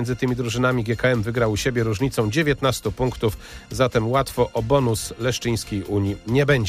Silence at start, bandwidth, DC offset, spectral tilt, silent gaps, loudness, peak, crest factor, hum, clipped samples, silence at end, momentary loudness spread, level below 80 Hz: 0 s; 15.5 kHz; under 0.1%; -5.5 dB/octave; none; -22 LUFS; -6 dBFS; 16 dB; none; under 0.1%; 0 s; 5 LU; -40 dBFS